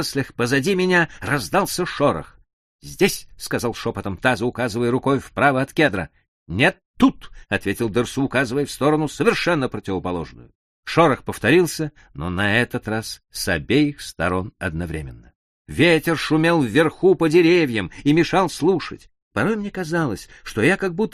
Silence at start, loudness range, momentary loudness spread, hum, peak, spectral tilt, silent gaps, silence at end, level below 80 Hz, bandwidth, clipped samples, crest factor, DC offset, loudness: 0 s; 5 LU; 12 LU; none; -2 dBFS; -5.5 dB/octave; 2.53-2.79 s, 6.28-6.46 s, 6.85-6.94 s, 10.55-10.83 s, 15.35-15.65 s, 19.22-19.31 s; 0.05 s; -46 dBFS; 15 kHz; under 0.1%; 18 dB; under 0.1%; -20 LUFS